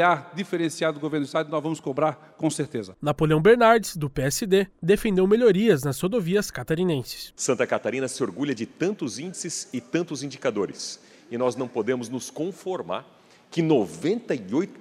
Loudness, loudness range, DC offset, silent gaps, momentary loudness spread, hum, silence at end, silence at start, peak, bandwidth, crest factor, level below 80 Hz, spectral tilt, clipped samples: -25 LUFS; 8 LU; under 0.1%; none; 13 LU; none; 0 s; 0 s; -6 dBFS; 19 kHz; 20 dB; -52 dBFS; -5 dB/octave; under 0.1%